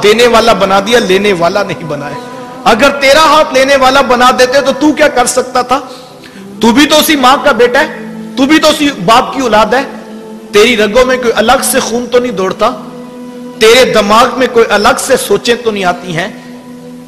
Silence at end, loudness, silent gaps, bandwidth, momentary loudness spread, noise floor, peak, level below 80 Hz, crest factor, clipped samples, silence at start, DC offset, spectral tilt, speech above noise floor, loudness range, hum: 0 s; -8 LUFS; none; 16 kHz; 18 LU; -29 dBFS; 0 dBFS; -38 dBFS; 8 dB; 0.3%; 0 s; 0.5%; -3 dB/octave; 22 dB; 3 LU; none